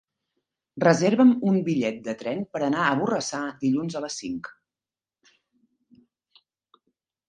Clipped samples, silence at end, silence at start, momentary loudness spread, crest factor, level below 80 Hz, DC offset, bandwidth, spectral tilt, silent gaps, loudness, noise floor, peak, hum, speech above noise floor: under 0.1%; 2.8 s; 0.75 s; 14 LU; 22 dB; -68 dBFS; under 0.1%; 9.4 kHz; -5.5 dB/octave; none; -24 LUFS; under -90 dBFS; -4 dBFS; none; over 67 dB